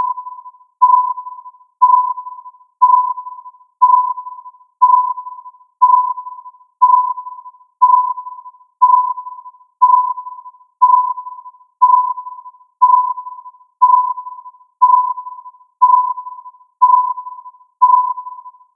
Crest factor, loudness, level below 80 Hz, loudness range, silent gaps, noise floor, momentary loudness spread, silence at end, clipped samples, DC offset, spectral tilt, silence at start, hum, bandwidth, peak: 16 dB; -13 LUFS; under -90 dBFS; 0 LU; none; -37 dBFS; 21 LU; 0.25 s; under 0.1%; under 0.1%; -1.5 dB/octave; 0 s; none; 1.1 kHz; 0 dBFS